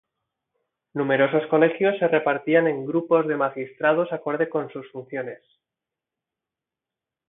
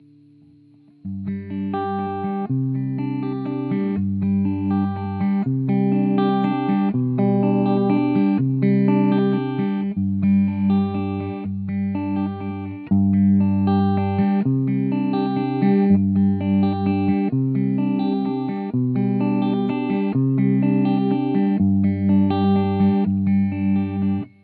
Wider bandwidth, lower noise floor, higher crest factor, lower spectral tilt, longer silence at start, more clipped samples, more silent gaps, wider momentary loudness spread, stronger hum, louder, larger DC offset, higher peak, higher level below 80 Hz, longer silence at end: second, 3.9 kHz vs 4.6 kHz; first, -88 dBFS vs -51 dBFS; first, 20 dB vs 14 dB; second, -10.5 dB/octave vs -12.5 dB/octave; about the same, 0.95 s vs 1.05 s; neither; neither; first, 13 LU vs 7 LU; neither; about the same, -22 LUFS vs -20 LUFS; neither; about the same, -6 dBFS vs -6 dBFS; second, -76 dBFS vs -64 dBFS; first, 1.95 s vs 0.15 s